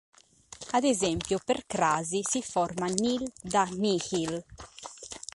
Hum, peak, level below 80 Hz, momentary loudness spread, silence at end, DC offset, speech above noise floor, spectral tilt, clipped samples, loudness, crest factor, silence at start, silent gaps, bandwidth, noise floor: none; -6 dBFS; -58 dBFS; 16 LU; 0.2 s; under 0.1%; 21 dB; -3.5 dB/octave; under 0.1%; -29 LUFS; 24 dB; 0.5 s; none; 11.5 kHz; -50 dBFS